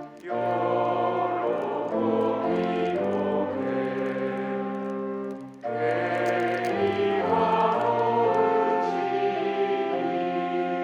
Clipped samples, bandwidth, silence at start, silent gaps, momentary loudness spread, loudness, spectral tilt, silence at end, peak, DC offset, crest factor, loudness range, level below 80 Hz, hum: under 0.1%; 10.5 kHz; 0 s; none; 7 LU; -26 LUFS; -7 dB/octave; 0 s; -10 dBFS; under 0.1%; 14 dB; 5 LU; -70 dBFS; none